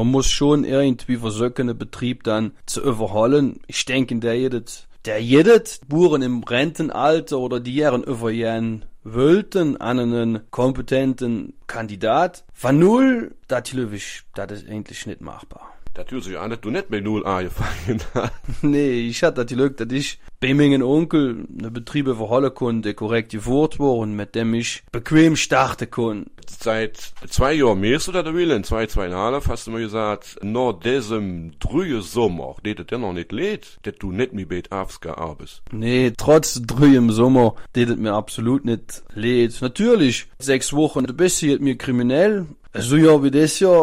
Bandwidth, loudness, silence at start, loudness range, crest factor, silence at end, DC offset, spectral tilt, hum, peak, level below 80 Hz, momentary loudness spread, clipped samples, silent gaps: 16 kHz; -20 LUFS; 0 s; 7 LU; 16 dB; 0 s; under 0.1%; -5.5 dB/octave; none; -4 dBFS; -38 dBFS; 14 LU; under 0.1%; none